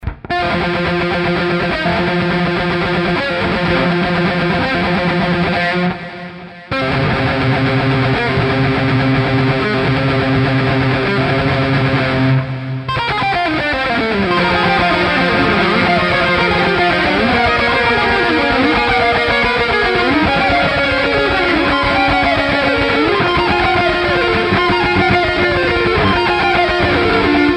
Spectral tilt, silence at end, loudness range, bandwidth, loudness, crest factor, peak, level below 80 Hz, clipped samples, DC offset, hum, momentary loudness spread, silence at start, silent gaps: -6.5 dB/octave; 0 s; 3 LU; 10.5 kHz; -14 LUFS; 12 dB; -2 dBFS; -32 dBFS; under 0.1%; under 0.1%; none; 3 LU; 0 s; none